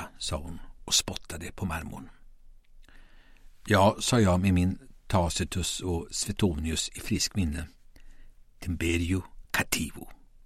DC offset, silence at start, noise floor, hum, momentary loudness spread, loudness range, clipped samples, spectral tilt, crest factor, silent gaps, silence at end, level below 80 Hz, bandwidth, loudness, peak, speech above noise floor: under 0.1%; 0 s; -51 dBFS; none; 18 LU; 6 LU; under 0.1%; -4 dB/octave; 24 dB; none; 0.3 s; -44 dBFS; 16 kHz; -28 LUFS; -6 dBFS; 23 dB